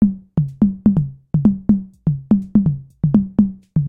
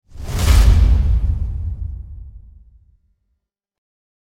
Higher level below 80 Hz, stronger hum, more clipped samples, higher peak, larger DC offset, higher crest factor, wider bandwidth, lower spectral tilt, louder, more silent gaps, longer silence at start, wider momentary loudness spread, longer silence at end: second, -38 dBFS vs -18 dBFS; neither; neither; about the same, -2 dBFS vs 0 dBFS; neither; about the same, 16 dB vs 18 dB; second, 1.9 kHz vs 15.5 kHz; first, -12.5 dB/octave vs -5.5 dB/octave; about the same, -18 LUFS vs -17 LUFS; neither; second, 0 s vs 0.15 s; second, 7 LU vs 21 LU; second, 0 s vs 1.95 s